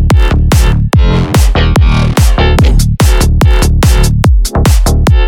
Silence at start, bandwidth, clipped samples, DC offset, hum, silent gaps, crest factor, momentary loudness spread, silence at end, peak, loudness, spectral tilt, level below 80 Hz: 0 s; 17.5 kHz; under 0.1%; under 0.1%; none; none; 6 dB; 1 LU; 0 s; 0 dBFS; -9 LUFS; -5.5 dB/octave; -8 dBFS